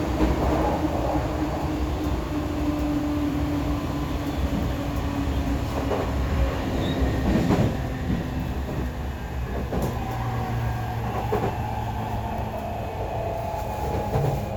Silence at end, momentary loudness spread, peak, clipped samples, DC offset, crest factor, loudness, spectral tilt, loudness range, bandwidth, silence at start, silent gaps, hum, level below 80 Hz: 0 s; 6 LU; -8 dBFS; under 0.1%; under 0.1%; 18 dB; -27 LUFS; -7 dB/octave; 3 LU; over 20 kHz; 0 s; none; none; -32 dBFS